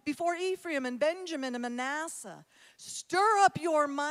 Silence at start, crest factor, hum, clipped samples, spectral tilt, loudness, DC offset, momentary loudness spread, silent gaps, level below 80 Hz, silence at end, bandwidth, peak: 0.05 s; 20 dB; none; under 0.1%; -3 dB/octave; -30 LUFS; under 0.1%; 16 LU; none; -80 dBFS; 0 s; 15.5 kHz; -12 dBFS